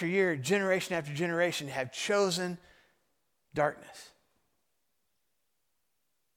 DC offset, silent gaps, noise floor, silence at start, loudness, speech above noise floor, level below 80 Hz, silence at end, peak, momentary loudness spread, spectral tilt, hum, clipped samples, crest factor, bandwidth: under 0.1%; none; -82 dBFS; 0 s; -31 LUFS; 51 dB; -72 dBFS; 2.3 s; -14 dBFS; 16 LU; -4.5 dB/octave; none; under 0.1%; 20 dB; 17 kHz